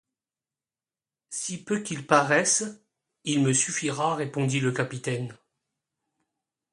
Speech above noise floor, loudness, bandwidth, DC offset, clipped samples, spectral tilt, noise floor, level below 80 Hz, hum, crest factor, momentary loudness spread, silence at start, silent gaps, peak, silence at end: over 64 dB; -25 LUFS; 11.5 kHz; under 0.1%; under 0.1%; -4 dB/octave; under -90 dBFS; -70 dBFS; none; 26 dB; 12 LU; 1.3 s; none; -4 dBFS; 1.4 s